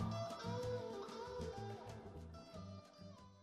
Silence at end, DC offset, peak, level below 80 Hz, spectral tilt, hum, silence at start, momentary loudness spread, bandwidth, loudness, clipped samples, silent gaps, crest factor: 0 s; under 0.1%; -30 dBFS; -64 dBFS; -6 dB/octave; none; 0 s; 13 LU; 13 kHz; -48 LUFS; under 0.1%; none; 16 dB